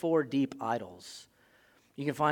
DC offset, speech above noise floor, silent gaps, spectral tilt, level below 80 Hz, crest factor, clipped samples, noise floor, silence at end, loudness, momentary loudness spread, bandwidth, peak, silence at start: under 0.1%; 34 dB; none; -6 dB/octave; -76 dBFS; 20 dB; under 0.1%; -65 dBFS; 0 s; -32 LUFS; 19 LU; 17.5 kHz; -12 dBFS; 0 s